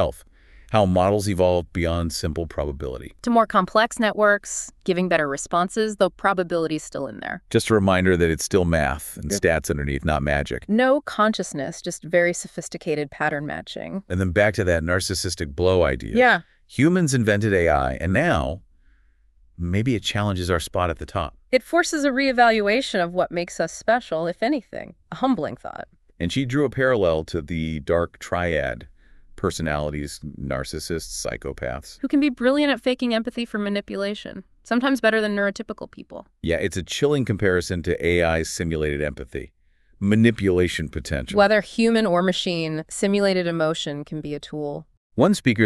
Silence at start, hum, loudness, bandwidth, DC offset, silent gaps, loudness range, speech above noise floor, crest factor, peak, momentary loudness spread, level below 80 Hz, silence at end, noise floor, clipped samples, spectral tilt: 0 s; none; -22 LUFS; 13.5 kHz; under 0.1%; 44.97-45.10 s; 4 LU; 35 dB; 18 dB; -4 dBFS; 13 LU; -40 dBFS; 0 s; -57 dBFS; under 0.1%; -5 dB/octave